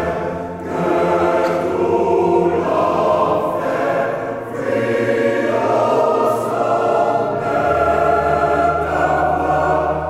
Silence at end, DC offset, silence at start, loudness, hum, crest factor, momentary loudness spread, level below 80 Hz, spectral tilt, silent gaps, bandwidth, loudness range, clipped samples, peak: 0 s; under 0.1%; 0 s; -17 LUFS; none; 14 dB; 6 LU; -42 dBFS; -7 dB/octave; none; 15 kHz; 1 LU; under 0.1%; -2 dBFS